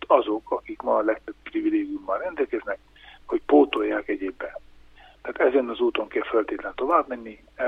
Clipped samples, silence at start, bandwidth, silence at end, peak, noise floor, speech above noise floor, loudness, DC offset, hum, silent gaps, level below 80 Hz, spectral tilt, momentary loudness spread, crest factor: under 0.1%; 0 s; 4.8 kHz; 0 s; -4 dBFS; -50 dBFS; 26 dB; -25 LUFS; under 0.1%; none; none; -56 dBFS; -6.5 dB/octave; 15 LU; 22 dB